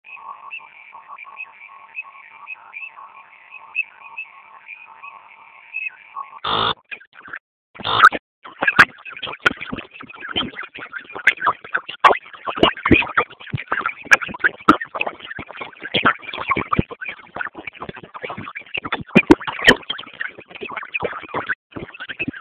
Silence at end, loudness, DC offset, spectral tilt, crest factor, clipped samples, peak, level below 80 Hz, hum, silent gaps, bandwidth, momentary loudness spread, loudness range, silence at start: 0 s; -19 LUFS; under 0.1%; -4.5 dB/octave; 22 dB; 0.1%; 0 dBFS; -46 dBFS; 50 Hz at -60 dBFS; 7.07-7.12 s, 7.40-7.74 s, 8.19-8.42 s, 21.55-21.70 s; 15.5 kHz; 22 LU; 14 LU; 0.05 s